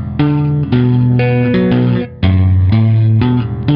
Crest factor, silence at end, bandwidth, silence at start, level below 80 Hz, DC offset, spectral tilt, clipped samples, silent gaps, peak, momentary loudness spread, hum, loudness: 10 dB; 0 s; 5.2 kHz; 0 s; -32 dBFS; under 0.1%; -11.5 dB/octave; under 0.1%; none; 0 dBFS; 4 LU; none; -12 LUFS